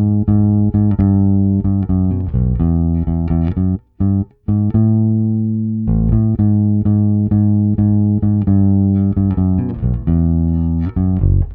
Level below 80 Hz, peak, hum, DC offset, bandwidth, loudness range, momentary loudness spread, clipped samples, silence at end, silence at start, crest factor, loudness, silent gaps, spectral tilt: -26 dBFS; -2 dBFS; none; under 0.1%; 2.4 kHz; 2 LU; 4 LU; under 0.1%; 0 s; 0 s; 12 dB; -15 LUFS; none; -14.5 dB/octave